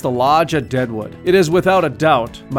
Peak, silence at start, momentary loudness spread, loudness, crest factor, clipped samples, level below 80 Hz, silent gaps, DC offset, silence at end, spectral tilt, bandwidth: -2 dBFS; 0 s; 7 LU; -15 LUFS; 14 dB; under 0.1%; -44 dBFS; none; under 0.1%; 0 s; -6 dB/octave; 16.5 kHz